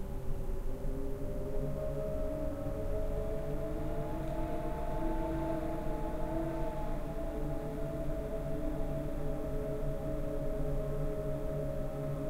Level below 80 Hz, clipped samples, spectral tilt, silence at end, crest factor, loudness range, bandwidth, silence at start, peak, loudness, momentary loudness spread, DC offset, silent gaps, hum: -38 dBFS; under 0.1%; -8 dB/octave; 0 s; 12 dB; 1 LU; 15.5 kHz; 0 s; -22 dBFS; -38 LUFS; 3 LU; under 0.1%; none; none